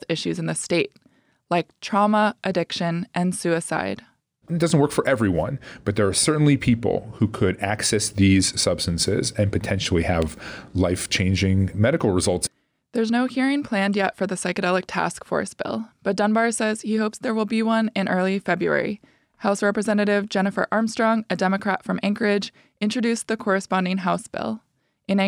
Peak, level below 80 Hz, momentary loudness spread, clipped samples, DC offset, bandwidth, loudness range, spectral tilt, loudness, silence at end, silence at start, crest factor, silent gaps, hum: -8 dBFS; -48 dBFS; 8 LU; under 0.1%; under 0.1%; over 20 kHz; 3 LU; -5 dB/octave; -22 LUFS; 0 s; 0 s; 14 dB; none; none